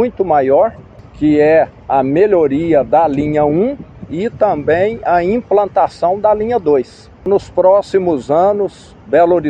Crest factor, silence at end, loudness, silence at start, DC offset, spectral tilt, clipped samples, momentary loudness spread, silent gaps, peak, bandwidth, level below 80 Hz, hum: 12 dB; 0 s; -13 LUFS; 0 s; under 0.1%; -8 dB/octave; under 0.1%; 7 LU; none; 0 dBFS; 9 kHz; -42 dBFS; none